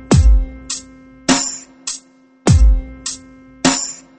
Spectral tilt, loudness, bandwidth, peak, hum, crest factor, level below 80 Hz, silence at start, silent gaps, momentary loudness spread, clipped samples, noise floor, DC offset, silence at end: -4.5 dB/octave; -17 LUFS; 8.8 kHz; 0 dBFS; none; 16 dB; -18 dBFS; 0 s; none; 14 LU; under 0.1%; -45 dBFS; under 0.1%; 0.25 s